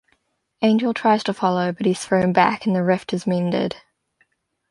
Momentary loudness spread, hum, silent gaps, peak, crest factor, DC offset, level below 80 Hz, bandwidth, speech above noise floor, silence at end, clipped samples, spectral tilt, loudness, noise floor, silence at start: 5 LU; none; none; -2 dBFS; 18 dB; under 0.1%; -60 dBFS; 11.5 kHz; 48 dB; 0.95 s; under 0.1%; -6 dB/octave; -20 LUFS; -67 dBFS; 0.6 s